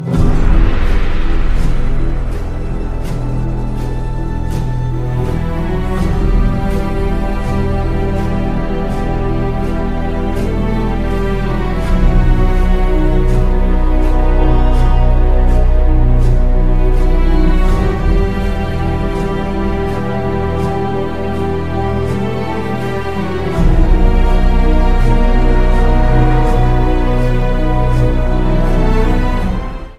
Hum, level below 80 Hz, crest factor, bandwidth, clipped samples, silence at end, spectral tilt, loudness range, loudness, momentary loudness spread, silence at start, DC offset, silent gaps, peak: none; -12 dBFS; 12 dB; 6.2 kHz; under 0.1%; 0 s; -8 dB/octave; 5 LU; -16 LUFS; 5 LU; 0 s; under 0.1%; none; 0 dBFS